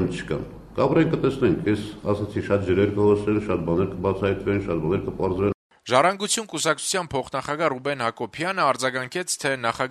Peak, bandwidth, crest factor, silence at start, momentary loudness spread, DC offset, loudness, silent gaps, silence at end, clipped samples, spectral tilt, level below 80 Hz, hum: -2 dBFS; 13.5 kHz; 20 dB; 0 s; 8 LU; under 0.1%; -24 LUFS; 5.54-5.70 s; 0 s; under 0.1%; -5 dB/octave; -48 dBFS; none